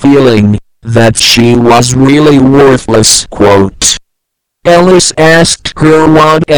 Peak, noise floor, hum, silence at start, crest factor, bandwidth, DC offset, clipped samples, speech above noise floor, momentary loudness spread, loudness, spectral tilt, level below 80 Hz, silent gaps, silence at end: 0 dBFS; -70 dBFS; none; 0 s; 6 dB; over 20 kHz; 2%; 8%; 65 dB; 5 LU; -5 LUFS; -4.5 dB/octave; -30 dBFS; none; 0 s